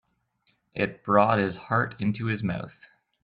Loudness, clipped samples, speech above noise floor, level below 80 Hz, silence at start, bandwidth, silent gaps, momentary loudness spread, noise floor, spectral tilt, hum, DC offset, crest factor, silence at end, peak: -26 LUFS; under 0.1%; 46 dB; -62 dBFS; 0.75 s; 5 kHz; none; 14 LU; -72 dBFS; -10 dB/octave; none; under 0.1%; 22 dB; 0.55 s; -6 dBFS